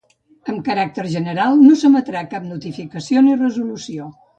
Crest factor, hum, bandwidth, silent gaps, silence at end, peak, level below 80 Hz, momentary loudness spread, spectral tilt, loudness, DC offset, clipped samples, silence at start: 16 dB; none; 8.2 kHz; none; 0.25 s; 0 dBFS; -62 dBFS; 19 LU; -6.5 dB/octave; -16 LUFS; under 0.1%; under 0.1%; 0.45 s